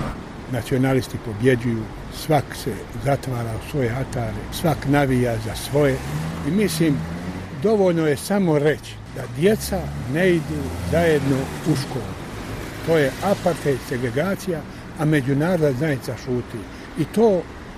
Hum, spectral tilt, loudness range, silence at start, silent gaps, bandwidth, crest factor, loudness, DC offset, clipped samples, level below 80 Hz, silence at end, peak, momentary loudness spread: none; -6.5 dB/octave; 3 LU; 0 s; none; 15.5 kHz; 18 dB; -22 LUFS; under 0.1%; under 0.1%; -40 dBFS; 0 s; -4 dBFS; 11 LU